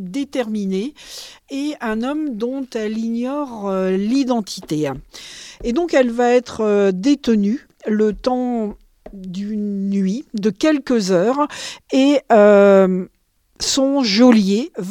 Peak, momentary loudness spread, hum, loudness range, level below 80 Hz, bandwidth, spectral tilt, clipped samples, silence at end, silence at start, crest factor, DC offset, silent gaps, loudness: -2 dBFS; 16 LU; none; 8 LU; -50 dBFS; 14 kHz; -5.5 dB/octave; under 0.1%; 0 s; 0 s; 16 dB; under 0.1%; none; -18 LUFS